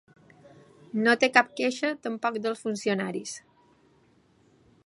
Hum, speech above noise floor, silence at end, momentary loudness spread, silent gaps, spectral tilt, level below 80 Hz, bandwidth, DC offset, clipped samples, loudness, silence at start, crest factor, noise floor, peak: none; 36 dB; 1.45 s; 14 LU; none; -4 dB/octave; -76 dBFS; 11.5 kHz; under 0.1%; under 0.1%; -26 LUFS; 0.95 s; 26 dB; -63 dBFS; -4 dBFS